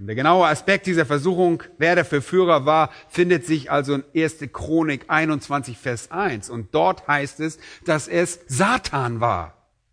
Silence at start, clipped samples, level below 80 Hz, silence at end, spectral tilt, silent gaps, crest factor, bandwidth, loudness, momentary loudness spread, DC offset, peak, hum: 0 s; under 0.1%; -52 dBFS; 0.45 s; -5.5 dB/octave; none; 18 dB; 11 kHz; -21 LUFS; 10 LU; under 0.1%; -2 dBFS; none